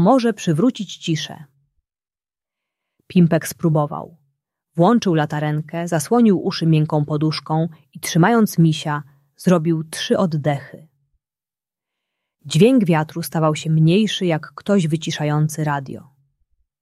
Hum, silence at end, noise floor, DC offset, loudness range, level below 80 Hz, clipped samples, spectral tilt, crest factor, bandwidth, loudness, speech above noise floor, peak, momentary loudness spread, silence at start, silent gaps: none; 0.8 s; under -90 dBFS; under 0.1%; 5 LU; -62 dBFS; under 0.1%; -6.5 dB/octave; 18 dB; 13 kHz; -19 LUFS; over 72 dB; -2 dBFS; 11 LU; 0 s; none